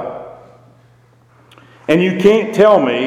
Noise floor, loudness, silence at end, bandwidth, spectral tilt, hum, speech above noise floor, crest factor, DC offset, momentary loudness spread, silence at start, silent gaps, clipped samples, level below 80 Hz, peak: -50 dBFS; -12 LUFS; 0 s; 14 kHz; -6.5 dB/octave; none; 38 dB; 16 dB; under 0.1%; 18 LU; 0 s; none; under 0.1%; -54 dBFS; 0 dBFS